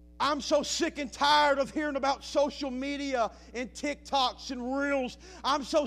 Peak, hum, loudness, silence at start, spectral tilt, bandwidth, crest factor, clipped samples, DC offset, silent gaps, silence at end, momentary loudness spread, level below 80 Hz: -12 dBFS; none; -29 LUFS; 0.15 s; -2.5 dB/octave; 15 kHz; 18 dB; under 0.1%; under 0.1%; none; 0 s; 11 LU; -54 dBFS